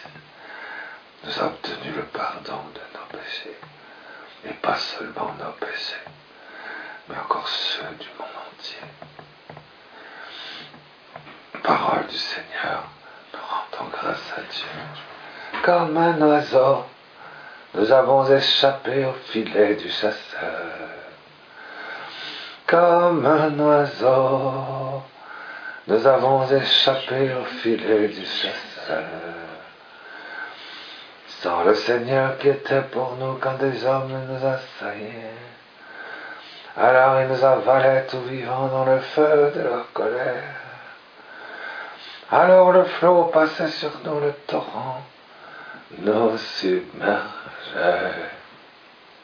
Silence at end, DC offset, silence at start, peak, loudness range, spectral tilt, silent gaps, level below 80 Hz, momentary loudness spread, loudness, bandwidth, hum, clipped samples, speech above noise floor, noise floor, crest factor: 0.75 s; under 0.1%; 0 s; -2 dBFS; 12 LU; -6 dB/octave; none; -68 dBFS; 22 LU; -21 LUFS; 5.4 kHz; none; under 0.1%; 28 dB; -49 dBFS; 20 dB